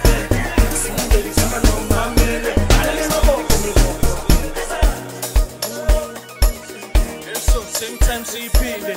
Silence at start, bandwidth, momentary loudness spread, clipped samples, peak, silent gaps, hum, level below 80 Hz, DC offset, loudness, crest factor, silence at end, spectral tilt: 0 s; 16.5 kHz; 6 LU; under 0.1%; -2 dBFS; none; none; -18 dBFS; under 0.1%; -19 LUFS; 14 dB; 0 s; -4 dB/octave